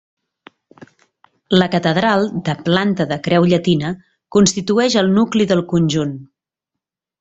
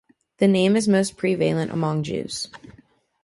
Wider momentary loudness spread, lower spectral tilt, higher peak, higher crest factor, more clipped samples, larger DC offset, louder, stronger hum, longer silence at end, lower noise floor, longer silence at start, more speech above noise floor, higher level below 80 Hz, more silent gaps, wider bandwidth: second, 7 LU vs 11 LU; about the same, -5.5 dB/octave vs -5.5 dB/octave; first, 0 dBFS vs -6 dBFS; about the same, 18 dB vs 16 dB; neither; neither; first, -16 LUFS vs -22 LUFS; neither; first, 0.95 s vs 0.55 s; first, -83 dBFS vs -54 dBFS; first, 1.5 s vs 0.4 s; first, 68 dB vs 33 dB; first, -52 dBFS vs -60 dBFS; neither; second, 8 kHz vs 11.5 kHz